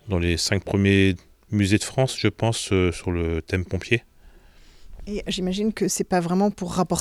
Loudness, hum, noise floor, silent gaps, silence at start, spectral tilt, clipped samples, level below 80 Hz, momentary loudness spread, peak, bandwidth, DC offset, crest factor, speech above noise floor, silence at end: -23 LUFS; none; -50 dBFS; none; 0.05 s; -5 dB/octave; under 0.1%; -42 dBFS; 7 LU; -4 dBFS; 14.5 kHz; under 0.1%; 20 dB; 27 dB; 0 s